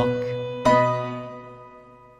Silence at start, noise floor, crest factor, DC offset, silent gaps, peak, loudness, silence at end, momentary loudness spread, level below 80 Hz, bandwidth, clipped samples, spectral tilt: 0 s; -48 dBFS; 20 dB; under 0.1%; none; -6 dBFS; -22 LUFS; 0.3 s; 23 LU; -54 dBFS; 12.5 kHz; under 0.1%; -6.5 dB/octave